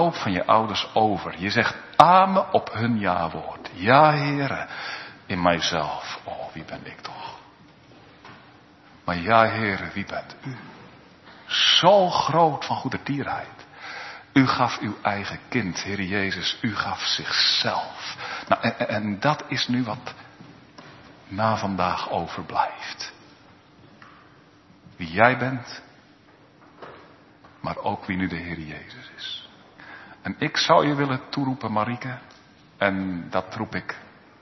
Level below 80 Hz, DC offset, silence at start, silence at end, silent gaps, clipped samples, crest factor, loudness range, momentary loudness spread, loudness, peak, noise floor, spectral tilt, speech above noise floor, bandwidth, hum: -58 dBFS; under 0.1%; 0 s; 0.35 s; none; under 0.1%; 24 dB; 11 LU; 18 LU; -23 LUFS; 0 dBFS; -54 dBFS; -4.5 dB/octave; 30 dB; 9.2 kHz; none